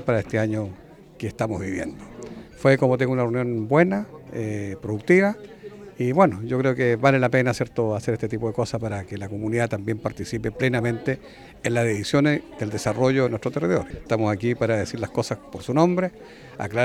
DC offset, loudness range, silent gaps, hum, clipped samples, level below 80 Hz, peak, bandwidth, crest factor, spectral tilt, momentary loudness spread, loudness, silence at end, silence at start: under 0.1%; 4 LU; none; none; under 0.1%; -52 dBFS; -4 dBFS; 13.5 kHz; 20 dB; -6.5 dB/octave; 13 LU; -23 LUFS; 0 s; 0 s